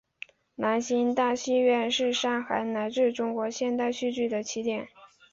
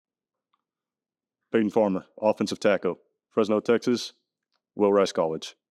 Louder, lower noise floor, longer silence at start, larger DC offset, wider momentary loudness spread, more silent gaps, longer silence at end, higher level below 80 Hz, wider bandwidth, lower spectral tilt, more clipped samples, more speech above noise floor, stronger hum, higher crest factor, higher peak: about the same, -27 LUFS vs -25 LUFS; second, -49 dBFS vs under -90 dBFS; second, 0.6 s vs 1.55 s; neither; about the same, 9 LU vs 10 LU; neither; about the same, 0.25 s vs 0.2 s; first, -70 dBFS vs -78 dBFS; second, 7.8 kHz vs 12.5 kHz; second, -3 dB/octave vs -5.5 dB/octave; neither; second, 22 dB vs over 66 dB; neither; about the same, 14 dB vs 18 dB; second, -12 dBFS vs -8 dBFS